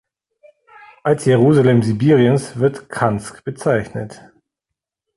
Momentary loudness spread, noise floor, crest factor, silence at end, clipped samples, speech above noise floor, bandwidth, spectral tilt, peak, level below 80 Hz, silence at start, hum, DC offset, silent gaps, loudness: 15 LU; -83 dBFS; 16 dB; 1 s; under 0.1%; 67 dB; 11.5 kHz; -7.5 dB/octave; -2 dBFS; -52 dBFS; 1.05 s; none; under 0.1%; none; -16 LUFS